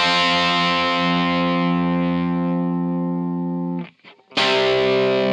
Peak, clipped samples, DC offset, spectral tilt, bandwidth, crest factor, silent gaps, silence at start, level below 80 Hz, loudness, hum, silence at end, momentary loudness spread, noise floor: -6 dBFS; under 0.1%; under 0.1%; -5.5 dB/octave; 10 kHz; 14 dB; none; 0 s; -52 dBFS; -19 LUFS; none; 0 s; 8 LU; -46 dBFS